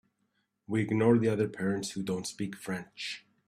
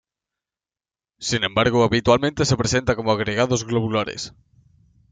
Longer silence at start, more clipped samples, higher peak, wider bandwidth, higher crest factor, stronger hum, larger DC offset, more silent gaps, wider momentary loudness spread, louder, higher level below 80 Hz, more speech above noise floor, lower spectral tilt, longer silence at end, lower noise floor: second, 0.7 s vs 1.2 s; neither; second, -12 dBFS vs -2 dBFS; first, 14 kHz vs 9.4 kHz; about the same, 20 dB vs 20 dB; neither; neither; neither; first, 13 LU vs 10 LU; second, -31 LUFS vs -20 LUFS; second, -66 dBFS vs -46 dBFS; second, 47 dB vs over 70 dB; first, -6 dB/octave vs -4.5 dB/octave; second, 0.3 s vs 0.8 s; second, -77 dBFS vs under -90 dBFS